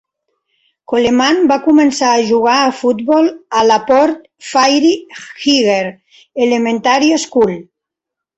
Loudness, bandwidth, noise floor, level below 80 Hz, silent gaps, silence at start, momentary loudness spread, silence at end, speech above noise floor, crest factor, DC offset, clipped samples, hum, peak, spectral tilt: -12 LUFS; 8.2 kHz; -82 dBFS; -54 dBFS; none; 0.9 s; 8 LU; 0.75 s; 69 dB; 12 dB; under 0.1%; under 0.1%; none; 0 dBFS; -3.5 dB/octave